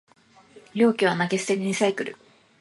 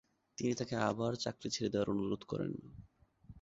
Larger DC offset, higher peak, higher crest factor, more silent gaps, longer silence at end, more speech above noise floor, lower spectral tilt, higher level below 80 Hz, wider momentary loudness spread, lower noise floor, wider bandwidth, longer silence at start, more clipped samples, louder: neither; first, -6 dBFS vs -18 dBFS; about the same, 18 dB vs 20 dB; neither; first, 0.45 s vs 0 s; first, 30 dB vs 22 dB; about the same, -5 dB/octave vs -5 dB/octave; second, -72 dBFS vs -66 dBFS; first, 13 LU vs 10 LU; second, -52 dBFS vs -59 dBFS; first, 11.5 kHz vs 7.6 kHz; first, 0.55 s vs 0.4 s; neither; first, -24 LUFS vs -37 LUFS